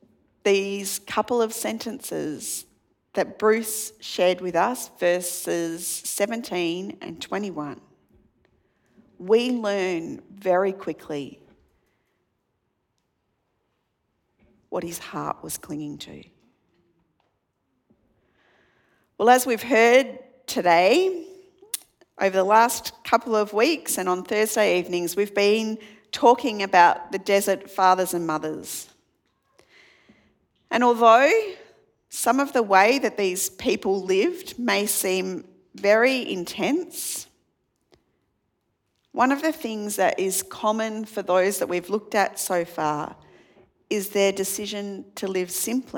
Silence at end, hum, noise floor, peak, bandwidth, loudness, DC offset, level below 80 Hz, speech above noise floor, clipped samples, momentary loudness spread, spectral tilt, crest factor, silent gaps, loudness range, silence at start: 0 s; none; -74 dBFS; -2 dBFS; 19 kHz; -23 LUFS; under 0.1%; -68 dBFS; 52 dB; under 0.1%; 15 LU; -3 dB/octave; 22 dB; none; 14 LU; 0.45 s